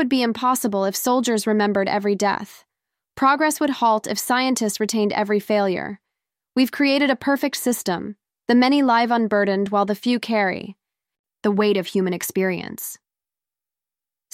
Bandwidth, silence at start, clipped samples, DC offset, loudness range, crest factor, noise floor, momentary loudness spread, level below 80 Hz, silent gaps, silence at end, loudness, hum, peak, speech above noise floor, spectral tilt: 16.5 kHz; 0 s; under 0.1%; under 0.1%; 4 LU; 16 dB; under -90 dBFS; 10 LU; -66 dBFS; 11.19-11.24 s; 1.4 s; -20 LUFS; none; -6 dBFS; over 70 dB; -4 dB/octave